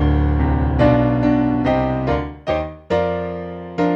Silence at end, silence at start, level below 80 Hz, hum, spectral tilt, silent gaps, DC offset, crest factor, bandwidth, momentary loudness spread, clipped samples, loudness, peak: 0 s; 0 s; -26 dBFS; none; -9.5 dB/octave; none; under 0.1%; 16 dB; 6.8 kHz; 9 LU; under 0.1%; -19 LUFS; -2 dBFS